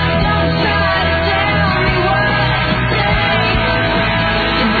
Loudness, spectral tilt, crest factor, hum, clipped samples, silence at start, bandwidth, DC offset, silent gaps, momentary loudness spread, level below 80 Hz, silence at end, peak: -14 LUFS; -7.5 dB/octave; 12 dB; none; under 0.1%; 0 s; 6.6 kHz; under 0.1%; none; 1 LU; -26 dBFS; 0 s; -2 dBFS